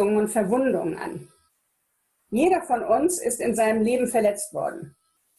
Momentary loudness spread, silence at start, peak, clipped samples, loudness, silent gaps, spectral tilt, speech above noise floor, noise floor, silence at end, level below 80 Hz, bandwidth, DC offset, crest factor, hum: 10 LU; 0 s; -10 dBFS; under 0.1%; -23 LUFS; none; -5 dB/octave; 50 dB; -73 dBFS; 0.5 s; -60 dBFS; 13.5 kHz; under 0.1%; 14 dB; none